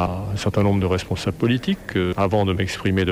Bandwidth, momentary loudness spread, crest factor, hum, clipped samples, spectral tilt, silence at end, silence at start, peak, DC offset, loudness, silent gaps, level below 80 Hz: 14 kHz; 4 LU; 14 dB; none; under 0.1%; -6.5 dB/octave; 0 s; 0 s; -6 dBFS; under 0.1%; -22 LUFS; none; -42 dBFS